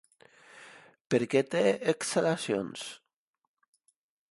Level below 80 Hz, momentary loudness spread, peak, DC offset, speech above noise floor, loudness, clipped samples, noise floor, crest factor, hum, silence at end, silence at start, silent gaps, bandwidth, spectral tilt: -74 dBFS; 21 LU; -12 dBFS; under 0.1%; 45 dB; -29 LUFS; under 0.1%; -74 dBFS; 20 dB; none; 1.35 s; 0.55 s; 1.01-1.05 s; 11.5 kHz; -4.5 dB/octave